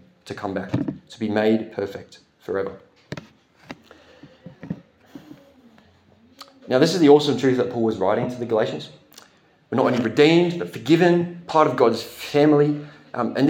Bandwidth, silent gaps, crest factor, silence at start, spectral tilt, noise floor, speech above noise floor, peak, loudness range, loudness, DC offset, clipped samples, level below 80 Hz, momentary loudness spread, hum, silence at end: 16.5 kHz; none; 20 dB; 0.25 s; -6.5 dB/octave; -55 dBFS; 36 dB; -2 dBFS; 16 LU; -20 LUFS; under 0.1%; under 0.1%; -66 dBFS; 22 LU; none; 0 s